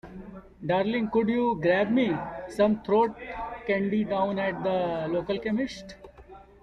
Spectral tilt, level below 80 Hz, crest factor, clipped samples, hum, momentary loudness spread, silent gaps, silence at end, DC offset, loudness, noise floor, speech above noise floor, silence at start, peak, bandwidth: -7 dB/octave; -54 dBFS; 16 dB; under 0.1%; none; 13 LU; none; 0.2 s; under 0.1%; -27 LUFS; -49 dBFS; 23 dB; 0.05 s; -12 dBFS; 10.5 kHz